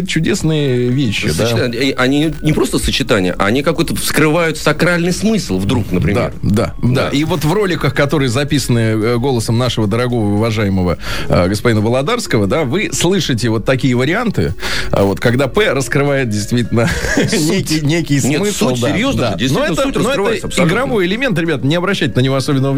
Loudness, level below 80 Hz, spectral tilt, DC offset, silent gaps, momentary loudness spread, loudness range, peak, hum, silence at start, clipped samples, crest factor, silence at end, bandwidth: -14 LUFS; -32 dBFS; -5.5 dB/octave; 4%; none; 3 LU; 1 LU; 0 dBFS; none; 0 s; under 0.1%; 14 dB; 0 s; over 20 kHz